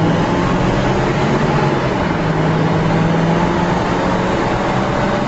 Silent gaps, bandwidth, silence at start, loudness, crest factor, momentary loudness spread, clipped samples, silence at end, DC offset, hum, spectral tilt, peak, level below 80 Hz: none; 8.2 kHz; 0 s; -16 LUFS; 12 dB; 2 LU; under 0.1%; 0 s; under 0.1%; none; -7 dB/octave; -4 dBFS; -30 dBFS